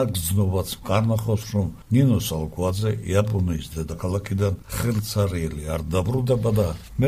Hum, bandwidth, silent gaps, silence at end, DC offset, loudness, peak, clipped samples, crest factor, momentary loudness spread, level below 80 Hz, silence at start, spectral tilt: none; 16 kHz; none; 0 s; under 0.1%; -24 LUFS; -6 dBFS; under 0.1%; 16 dB; 7 LU; -40 dBFS; 0 s; -6.5 dB/octave